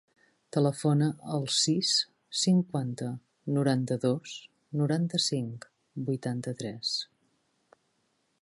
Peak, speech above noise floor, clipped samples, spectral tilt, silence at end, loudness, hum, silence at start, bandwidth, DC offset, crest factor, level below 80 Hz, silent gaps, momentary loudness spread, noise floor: -14 dBFS; 46 dB; under 0.1%; -5 dB/octave; 1.4 s; -29 LUFS; none; 0.55 s; 11.5 kHz; under 0.1%; 18 dB; -74 dBFS; none; 13 LU; -74 dBFS